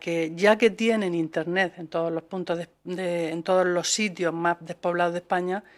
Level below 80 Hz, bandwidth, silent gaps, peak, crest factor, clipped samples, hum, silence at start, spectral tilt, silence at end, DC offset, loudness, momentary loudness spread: -70 dBFS; 13.5 kHz; none; -6 dBFS; 20 dB; under 0.1%; none; 0 s; -4 dB/octave; 0.15 s; under 0.1%; -25 LUFS; 9 LU